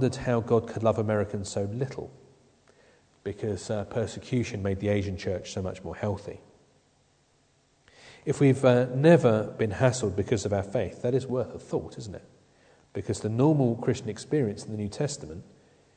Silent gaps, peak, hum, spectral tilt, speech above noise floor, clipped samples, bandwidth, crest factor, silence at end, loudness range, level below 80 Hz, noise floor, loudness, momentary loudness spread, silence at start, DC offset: none; -6 dBFS; none; -6.5 dB/octave; 39 dB; under 0.1%; 9.4 kHz; 22 dB; 0.55 s; 9 LU; -58 dBFS; -66 dBFS; -27 LUFS; 16 LU; 0 s; under 0.1%